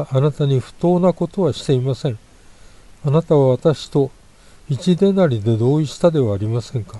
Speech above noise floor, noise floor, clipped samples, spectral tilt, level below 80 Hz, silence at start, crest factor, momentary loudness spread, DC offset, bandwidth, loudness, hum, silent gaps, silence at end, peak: 28 dB; -45 dBFS; under 0.1%; -8 dB/octave; -48 dBFS; 0 s; 16 dB; 9 LU; under 0.1%; 11.5 kHz; -18 LUFS; none; none; 0 s; -2 dBFS